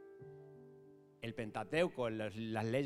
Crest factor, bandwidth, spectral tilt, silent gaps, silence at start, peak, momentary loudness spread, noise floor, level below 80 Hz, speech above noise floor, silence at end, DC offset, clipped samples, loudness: 22 dB; 14 kHz; -6.5 dB/octave; none; 0 s; -20 dBFS; 22 LU; -61 dBFS; -72 dBFS; 23 dB; 0 s; under 0.1%; under 0.1%; -40 LUFS